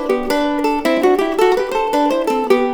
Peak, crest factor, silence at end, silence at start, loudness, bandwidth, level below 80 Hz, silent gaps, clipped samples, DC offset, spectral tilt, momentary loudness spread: 0 dBFS; 14 dB; 0 s; 0 s; -16 LUFS; over 20 kHz; -42 dBFS; none; under 0.1%; under 0.1%; -4 dB/octave; 3 LU